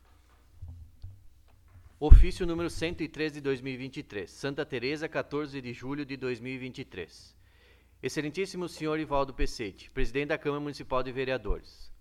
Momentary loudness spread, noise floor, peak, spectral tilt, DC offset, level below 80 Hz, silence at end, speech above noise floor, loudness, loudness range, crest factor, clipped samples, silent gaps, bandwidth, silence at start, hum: 13 LU; -60 dBFS; -2 dBFS; -6.5 dB/octave; under 0.1%; -30 dBFS; 0.05 s; 32 dB; -32 LUFS; 8 LU; 26 dB; under 0.1%; none; 11 kHz; 0.6 s; none